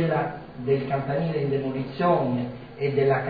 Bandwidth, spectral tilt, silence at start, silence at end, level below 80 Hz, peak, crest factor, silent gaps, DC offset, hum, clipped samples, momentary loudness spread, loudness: 5 kHz; -10.5 dB/octave; 0 s; 0 s; -56 dBFS; -10 dBFS; 16 dB; none; 0.2%; none; under 0.1%; 8 LU; -26 LUFS